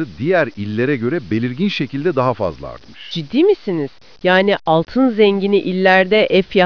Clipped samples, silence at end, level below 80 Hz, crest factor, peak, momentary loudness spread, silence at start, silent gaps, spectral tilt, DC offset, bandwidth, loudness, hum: under 0.1%; 0 s; -50 dBFS; 16 dB; 0 dBFS; 11 LU; 0 s; none; -7.5 dB/octave; 0.8%; 5.4 kHz; -16 LUFS; none